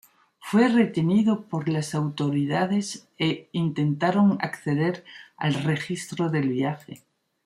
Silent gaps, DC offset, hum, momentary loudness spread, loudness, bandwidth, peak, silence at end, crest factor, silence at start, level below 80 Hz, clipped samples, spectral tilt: none; under 0.1%; none; 9 LU; -25 LUFS; 13 kHz; -8 dBFS; 0.5 s; 16 dB; 0.45 s; -66 dBFS; under 0.1%; -6.5 dB/octave